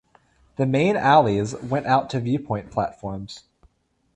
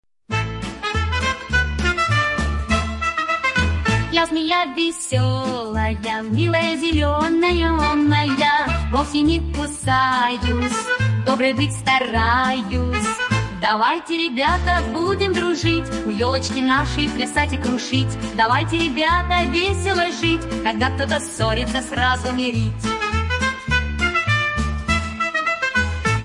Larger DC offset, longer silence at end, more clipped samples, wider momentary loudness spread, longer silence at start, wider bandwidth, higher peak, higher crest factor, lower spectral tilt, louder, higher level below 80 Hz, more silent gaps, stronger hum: neither; first, 0.75 s vs 0 s; neither; first, 18 LU vs 5 LU; first, 0.6 s vs 0.3 s; second, 9.8 kHz vs 11.5 kHz; about the same, -2 dBFS vs -2 dBFS; about the same, 20 dB vs 18 dB; first, -6.5 dB/octave vs -5 dB/octave; about the same, -22 LUFS vs -20 LUFS; second, -52 dBFS vs -32 dBFS; neither; neither